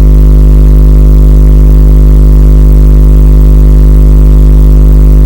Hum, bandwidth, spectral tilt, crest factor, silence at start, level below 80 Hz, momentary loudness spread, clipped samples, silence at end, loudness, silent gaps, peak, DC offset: 50 Hz at 0 dBFS; 16.5 kHz; -9.5 dB/octave; 0 dB; 0 s; -2 dBFS; 0 LU; 60%; 0 s; -5 LUFS; none; 0 dBFS; 4%